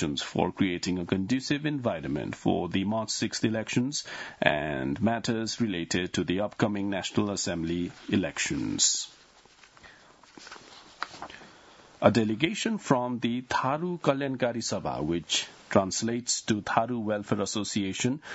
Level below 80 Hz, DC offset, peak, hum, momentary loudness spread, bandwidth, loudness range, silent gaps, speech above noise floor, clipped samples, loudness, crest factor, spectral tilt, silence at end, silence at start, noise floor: -60 dBFS; under 0.1%; -4 dBFS; none; 7 LU; 8.2 kHz; 3 LU; none; 28 dB; under 0.1%; -29 LUFS; 26 dB; -4 dB/octave; 0 s; 0 s; -57 dBFS